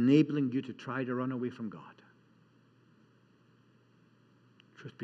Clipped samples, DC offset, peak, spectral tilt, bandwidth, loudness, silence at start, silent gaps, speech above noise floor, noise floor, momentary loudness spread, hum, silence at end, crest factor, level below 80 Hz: under 0.1%; under 0.1%; -14 dBFS; -8.5 dB/octave; 7.8 kHz; -33 LUFS; 0 s; none; 34 dB; -65 dBFS; 25 LU; none; 0 s; 22 dB; under -90 dBFS